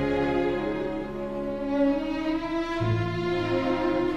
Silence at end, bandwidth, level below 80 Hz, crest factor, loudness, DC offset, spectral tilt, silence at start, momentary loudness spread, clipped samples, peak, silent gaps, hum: 0 s; 9 kHz; -44 dBFS; 14 dB; -27 LUFS; under 0.1%; -7.5 dB/octave; 0 s; 6 LU; under 0.1%; -12 dBFS; none; none